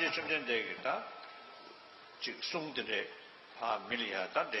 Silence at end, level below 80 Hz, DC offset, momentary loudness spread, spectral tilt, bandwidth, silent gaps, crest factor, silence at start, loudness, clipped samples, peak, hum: 0 s; -82 dBFS; under 0.1%; 19 LU; -3.5 dB/octave; 9.4 kHz; none; 20 dB; 0 s; -36 LUFS; under 0.1%; -18 dBFS; none